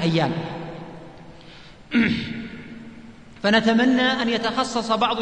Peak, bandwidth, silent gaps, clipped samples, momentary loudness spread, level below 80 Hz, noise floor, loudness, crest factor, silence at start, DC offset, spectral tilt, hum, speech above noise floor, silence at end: -4 dBFS; 9.8 kHz; none; under 0.1%; 22 LU; -52 dBFS; -45 dBFS; -21 LUFS; 20 dB; 0 s; 0.3%; -5 dB/octave; none; 24 dB; 0 s